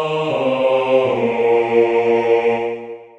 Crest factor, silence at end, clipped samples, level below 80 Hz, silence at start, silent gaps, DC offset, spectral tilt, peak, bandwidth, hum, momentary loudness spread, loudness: 14 dB; 0.1 s; under 0.1%; -58 dBFS; 0 s; none; under 0.1%; -6.5 dB/octave; -2 dBFS; 8 kHz; none; 5 LU; -16 LUFS